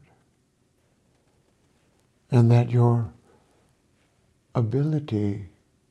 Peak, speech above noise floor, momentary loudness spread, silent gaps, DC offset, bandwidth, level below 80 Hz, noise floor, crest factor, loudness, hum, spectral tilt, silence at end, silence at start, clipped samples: -6 dBFS; 46 dB; 16 LU; none; under 0.1%; 6 kHz; -62 dBFS; -67 dBFS; 20 dB; -23 LUFS; none; -9.5 dB/octave; 0.45 s; 2.3 s; under 0.1%